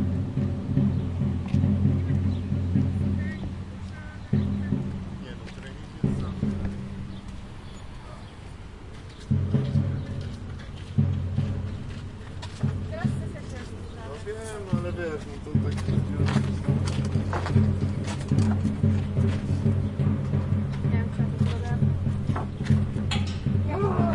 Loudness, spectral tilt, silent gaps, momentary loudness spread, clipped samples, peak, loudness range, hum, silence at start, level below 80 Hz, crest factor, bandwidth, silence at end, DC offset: -27 LUFS; -8 dB/octave; none; 14 LU; under 0.1%; -8 dBFS; 8 LU; none; 0 s; -42 dBFS; 18 dB; 11 kHz; 0 s; under 0.1%